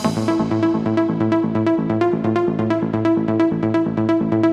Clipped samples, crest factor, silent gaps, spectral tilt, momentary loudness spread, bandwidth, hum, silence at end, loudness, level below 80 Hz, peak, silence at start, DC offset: under 0.1%; 14 dB; none; -8 dB/octave; 1 LU; 11 kHz; none; 0 s; -19 LUFS; -50 dBFS; -4 dBFS; 0 s; under 0.1%